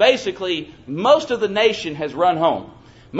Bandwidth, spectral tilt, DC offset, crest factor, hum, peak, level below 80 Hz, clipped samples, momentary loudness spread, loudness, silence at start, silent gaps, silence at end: 8 kHz; -4.5 dB/octave; under 0.1%; 18 dB; none; 0 dBFS; -56 dBFS; under 0.1%; 10 LU; -19 LUFS; 0 s; none; 0 s